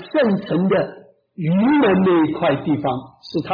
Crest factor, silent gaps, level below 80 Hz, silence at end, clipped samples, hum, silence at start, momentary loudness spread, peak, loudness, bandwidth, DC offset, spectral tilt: 10 dB; none; -56 dBFS; 0 s; under 0.1%; none; 0 s; 12 LU; -8 dBFS; -18 LUFS; 5.2 kHz; under 0.1%; -9.5 dB/octave